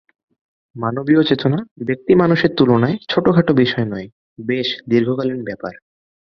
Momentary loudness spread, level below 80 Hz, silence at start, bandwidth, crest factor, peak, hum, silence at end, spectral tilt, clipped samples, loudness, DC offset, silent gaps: 13 LU; -52 dBFS; 0.75 s; 6.4 kHz; 16 dB; -2 dBFS; none; 0.65 s; -8.5 dB/octave; under 0.1%; -17 LUFS; under 0.1%; 1.71-1.76 s, 4.12-4.36 s